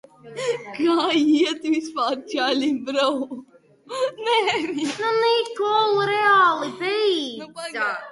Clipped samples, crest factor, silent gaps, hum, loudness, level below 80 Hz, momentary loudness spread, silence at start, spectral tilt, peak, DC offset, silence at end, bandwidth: under 0.1%; 16 dB; none; none; -21 LUFS; -70 dBFS; 11 LU; 0.25 s; -3.5 dB/octave; -6 dBFS; under 0.1%; 0 s; 11.5 kHz